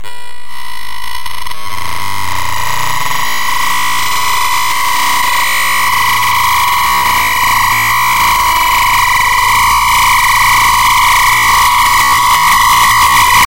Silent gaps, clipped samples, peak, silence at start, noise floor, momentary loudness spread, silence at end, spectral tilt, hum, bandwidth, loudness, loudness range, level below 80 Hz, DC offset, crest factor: none; under 0.1%; 0 dBFS; 0 s; -30 dBFS; 15 LU; 0 s; 0 dB/octave; none; 16.5 kHz; -9 LUFS; 8 LU; -30 dBFS; 9%; 12 dB